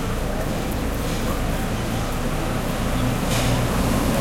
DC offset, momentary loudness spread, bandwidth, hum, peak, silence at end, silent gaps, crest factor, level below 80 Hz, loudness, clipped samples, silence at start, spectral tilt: under 0.1%; 5 LU; 16.5 kHz; none; -8 dBFS; 0 s; none; 14 dB; -28 dBFS; -24 LUFS; under 0.1%; 0 s; -5 dB/octave